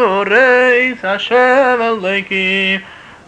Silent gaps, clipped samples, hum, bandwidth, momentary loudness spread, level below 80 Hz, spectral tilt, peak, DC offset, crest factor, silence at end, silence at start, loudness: none; under 0.1%; none; 8.8 kHz; 7 LU; -56 dBFS; -4.5 dB/octave; -2 dBFS; under 0.1%; 12 dB; 0.15 s; 0 s; -12 LUFS